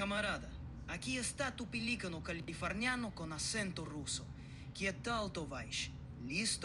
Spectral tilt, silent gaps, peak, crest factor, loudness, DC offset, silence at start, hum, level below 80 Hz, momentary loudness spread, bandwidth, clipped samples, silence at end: -3.5 dB/octave; none; -24 dBFS; 18 dB; -40 LUFS; under 0.1%; 0 s; none; -54 dBFS; 9 LU; 12.5 kHz; under 0.1%; 0 s